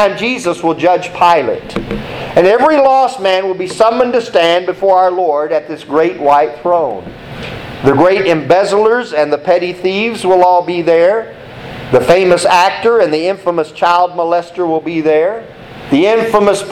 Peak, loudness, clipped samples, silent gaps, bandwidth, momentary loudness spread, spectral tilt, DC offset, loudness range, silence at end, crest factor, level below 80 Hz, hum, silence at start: 0 dBFS; -12 LUFS; under 0.1%; none; 14 kHz; 11 LU; -5 dB/octave; under 0.1%; 2 LU; 0 s; 12 dB; -44 dBFS; none; 0 s